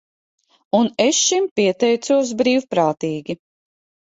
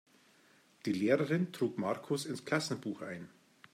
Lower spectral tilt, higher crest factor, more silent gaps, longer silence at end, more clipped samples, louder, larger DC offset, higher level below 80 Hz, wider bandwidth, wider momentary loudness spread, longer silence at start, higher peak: second, -3 dB/octave vs -5.5 dB/octave; about the same, 16 dB vs 20 dB; first, 1.51-1.56 s vs none; first, 0.7 s vs 0.45 s; neither; first, -18 LUFS vs -35 LUFS; neither; first, -64 dBFS vs -80 dBFS; second, 8.2 kHz vs 16 kHz; second, 10 LU vs 13 LU; about the same, 0.75 s vs 0.85 s; first, -2 dBFS vs -16 dBFS